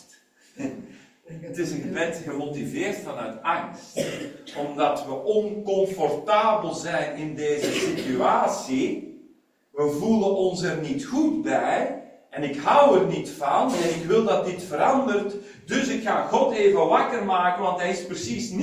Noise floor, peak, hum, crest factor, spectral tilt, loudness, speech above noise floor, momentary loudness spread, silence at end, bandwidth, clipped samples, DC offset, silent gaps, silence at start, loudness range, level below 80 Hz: -57 dBFS; -4 dBFS; none; 20 dB; -5 dB/octave; -24 LUFS; 34 dB; 13 LU; 0 s; 16 kHz; under 0.1%; under 0.1%; none; 0.55 s; 7 LU; -62 dBFS